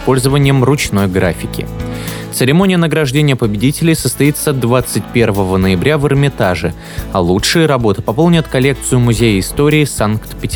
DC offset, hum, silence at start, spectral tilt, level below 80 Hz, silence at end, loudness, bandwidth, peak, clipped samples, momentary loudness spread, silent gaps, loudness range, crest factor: under 0.1%; none; 0 s; -5.5 dB/octave; -30 dBFS; 0 s; -13 LUFS; over 20 kHz; 0 dBFS; under 0.1%; 9 LU; none; 1 LU; 12 dB